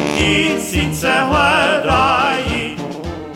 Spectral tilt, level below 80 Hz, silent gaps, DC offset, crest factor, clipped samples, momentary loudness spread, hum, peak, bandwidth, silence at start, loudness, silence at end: -4 dB/octave; -32 dBFS; none; under 0.1%; 14 dB; under 0.1%; 12 LU; none; -2 dBFS; 17 kHz; 0 s; -15 LUFS; 0 s